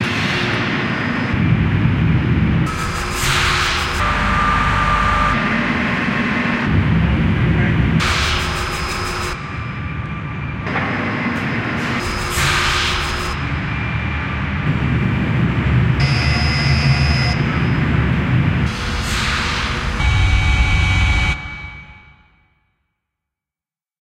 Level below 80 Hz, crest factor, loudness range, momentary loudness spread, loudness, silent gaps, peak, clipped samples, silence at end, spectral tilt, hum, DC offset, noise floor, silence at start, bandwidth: -26 dBFS; 14 dB; 4 LU; 6 LU; -17 LUFS; none; -2 dBFS; under 0.1%; 2.05 s; -5 dB/octave; none; under 0.1%; under -90 dBFS; 0 s; 16 kHz